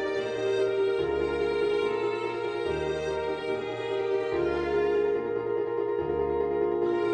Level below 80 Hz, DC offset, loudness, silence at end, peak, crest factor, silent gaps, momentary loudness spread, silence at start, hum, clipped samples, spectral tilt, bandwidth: -52 dBFS; under 0.1%; -28 LUFS; 0 s; -16 dBFS; 12 dB; none; 4 LU; 0 s; none; under 0.1%; -6 dB/octave; 9.4 kHz